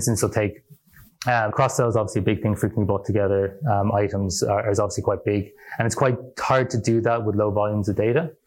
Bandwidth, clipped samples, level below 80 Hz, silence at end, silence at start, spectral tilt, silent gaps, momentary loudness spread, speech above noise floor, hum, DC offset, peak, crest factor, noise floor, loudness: 16.5 kHz; under 0.1%; -50 dBFS; 0.15 s; 0 s; -6 dB/octave; none; 5 LU; 29 dB; none; under 0.1%; -4 dBFS; 18 dB; -51 dBFS; -22 LUFS